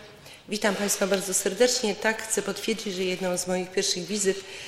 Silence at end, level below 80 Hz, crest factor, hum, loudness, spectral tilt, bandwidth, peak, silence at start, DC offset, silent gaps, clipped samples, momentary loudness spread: 0 s; -62 dBFS; 20 dB; none; -26 LUFS; -2.5 dB/octave; 16.5 kHz; -8 dBFS; 0 s; under 0.1%; none; under 0.1%; 7 LU